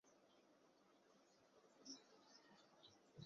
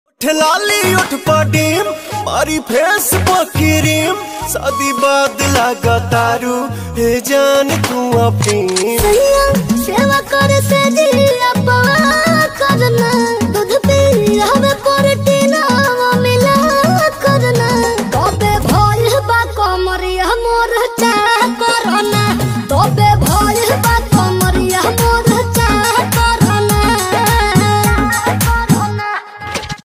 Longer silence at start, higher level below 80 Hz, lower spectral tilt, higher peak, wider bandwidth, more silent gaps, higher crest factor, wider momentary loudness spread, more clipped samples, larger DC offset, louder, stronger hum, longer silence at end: second, 0.05 s vs 0.2 s; second, under -90 dBFS vs -26 dBFS; about the same, -3.5 dB/octave vs -4.5 dB/octave; second, -46 dBFS vs 0 dBFS; second, 7.4 kHz vs 16 kHz; neither; first, 22 dB vs 12 dB; first, 9 LU vs 5 LU; neither; neither; second, -64 LUFS vs -12 LUFS; neither; about the same, 0 s vs 0.05 s